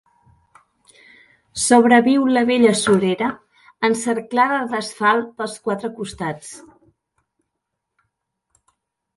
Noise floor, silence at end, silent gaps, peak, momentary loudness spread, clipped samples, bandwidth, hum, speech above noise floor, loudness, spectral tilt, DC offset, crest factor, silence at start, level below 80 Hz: -79 dBFS; 2.6 s; none; 0 dBFS; 15 LU; under 0.1%; 11.5 kHz; none; 61 dB; -18 LUFS; -4 dB/octave; under 0.1%; 20 dB; 1.55 s; -58 dBFS